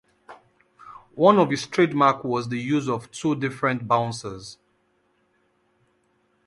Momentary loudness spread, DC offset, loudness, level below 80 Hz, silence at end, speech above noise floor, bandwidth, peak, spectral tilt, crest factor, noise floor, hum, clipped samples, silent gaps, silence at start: 17 LU; under 0.1%; -22 LUFS; -64 dBFS; 1.95 s; 45 dB; 11.5 kHz; -4 dBFS; -6 dB/octave; 22 dB; -67 dBFS; none; under 0.1%; none; 0.3 s